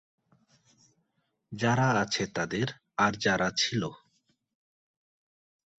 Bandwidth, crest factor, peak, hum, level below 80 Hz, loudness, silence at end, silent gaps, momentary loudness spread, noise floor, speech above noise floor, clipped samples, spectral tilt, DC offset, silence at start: 8.2 kHz; 22 dB; -10 dBFS; none; -62 dBFS; -28 LUFS; 1.8 s; none; 8 LU; -78 dBFS; 49 dB; under 0.1%; -4.5 dB/octave; under 0.1%; 1.5 s